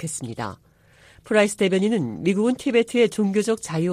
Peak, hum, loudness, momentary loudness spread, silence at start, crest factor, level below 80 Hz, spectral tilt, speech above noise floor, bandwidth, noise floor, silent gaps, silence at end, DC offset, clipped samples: -6 dBFS; none; -22 LUFS; 10 LU; 0 s; 16 dB; -60 dBFS; -5 dB/octave; 32 dB; 15 kHz; -53 dBFS; none; 0 s; under 0.1%; under 0.1%